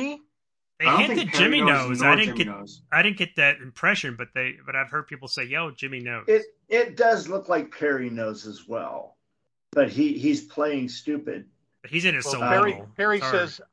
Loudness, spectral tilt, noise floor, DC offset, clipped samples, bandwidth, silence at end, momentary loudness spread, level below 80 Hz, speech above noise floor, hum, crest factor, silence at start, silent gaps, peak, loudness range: -23 LUFS; -4 dB/octave; -86 dBFS; under 0.1%; under 0.1%; 10.5 kHz; 0.1 s; 13 LU; -66 dBFS; 62 dB; none; 20 dB; 0 s; none; -4 dBFS; 7 LU